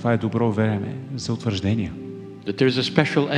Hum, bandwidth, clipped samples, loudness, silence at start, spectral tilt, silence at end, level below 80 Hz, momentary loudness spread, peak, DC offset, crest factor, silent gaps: none; 10 kHz; under 0.1%; -23 LUFS; 0 s; -6.5 dB/octave; 0 s; -54 dBFS; 12 LU; 0 dBFS; under 0.1%; 22 dB; none